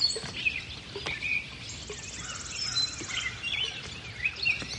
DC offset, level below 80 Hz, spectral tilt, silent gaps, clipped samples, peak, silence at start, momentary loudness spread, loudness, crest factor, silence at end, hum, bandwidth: under 0.1%; -54 dBFS; -1 dB/octave; none; under 0.1%; -14 dBFS; 0 s; 11 LU; -31 LUFS; 20 dB; 0 s; none; 11.5 kHz